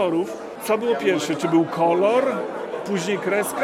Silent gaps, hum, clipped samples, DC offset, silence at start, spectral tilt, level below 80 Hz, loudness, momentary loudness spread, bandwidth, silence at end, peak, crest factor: none; none; under 0.1%; under 0.1%; 0 s; -5 dB/octave; -70 dBFS; -22 LUFS; 10 LU; 16 kHz; 0 s; -6 dBFS; 14 dB